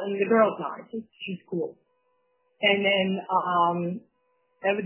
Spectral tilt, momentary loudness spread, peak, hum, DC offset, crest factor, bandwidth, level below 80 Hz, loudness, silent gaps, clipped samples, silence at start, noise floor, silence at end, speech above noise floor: -9 dB/octave; 15 LU; -8 dBFS; none; under 0.1%; 18 dB; 3.2 kHz; -76 dBFS; -25 LUFS; none; under 0.1%; 0 s; -71 dBFS; 0 s; 46 dB